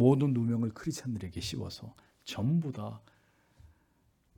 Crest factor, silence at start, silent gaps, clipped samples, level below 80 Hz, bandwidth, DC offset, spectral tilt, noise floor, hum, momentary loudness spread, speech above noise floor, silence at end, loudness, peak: 22 dB; 0 s; none; under 0.1%; -62 dBFS; 17.5 kHz; under 0.1%; -7 dB/octave; -70 dBFS; none; 18 LU; 39 dB; 1.4 s; -33 LUFS; -12 dBFS